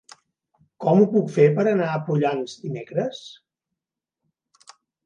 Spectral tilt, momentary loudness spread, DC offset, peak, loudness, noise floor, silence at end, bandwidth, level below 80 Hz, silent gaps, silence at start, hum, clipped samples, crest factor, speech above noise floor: -7.5 dB/octave; 13 LU; under 0.1%; -4 dBFS; -21 LUFS; -86 dBFS; 1.75 s; 9.4 kHz; -72 dBFS; none; 0.8 s; none; under 0.1%; 20 dB; 66 dB